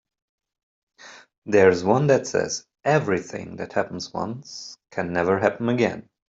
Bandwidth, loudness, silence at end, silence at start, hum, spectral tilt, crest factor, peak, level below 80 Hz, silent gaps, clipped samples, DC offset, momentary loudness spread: 7.8 kHz; -23 LUFS; 0.3 s; 1.05 s; none; -5.5 dB/octave; 20 dB; -4 dBFS; -62 dBFS; 1.38-1.42 s; under 0.1%; under 0.1%; 17 LU